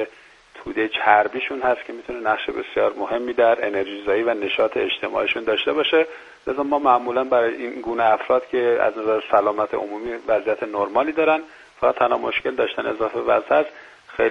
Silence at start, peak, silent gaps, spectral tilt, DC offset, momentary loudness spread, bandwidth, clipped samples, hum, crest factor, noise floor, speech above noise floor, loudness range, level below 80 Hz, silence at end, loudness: 0 s; 0 dBFS; none; -5.5 dB/octave; under 0.1%; 9 LU; 7.6 kHz; under 0.1%; none; 20 dB; -47 dBFS; 27 dB; 2 LU; -58 dBFS; 0 s; -21 LUFS